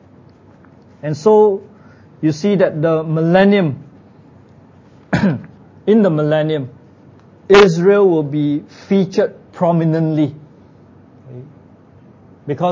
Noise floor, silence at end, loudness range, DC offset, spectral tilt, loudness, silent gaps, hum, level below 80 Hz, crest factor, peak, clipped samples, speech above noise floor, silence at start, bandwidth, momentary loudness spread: -45 dBFS; 0 s; 5 LU; under 0.1%; -7.5 dB/octave; -15 LUFS; none; none; -50 dBFS; 16 dB; 0 dBFS; under 0.1%; 31 dB; 1.05 s; 7.6 kHz; 15 LU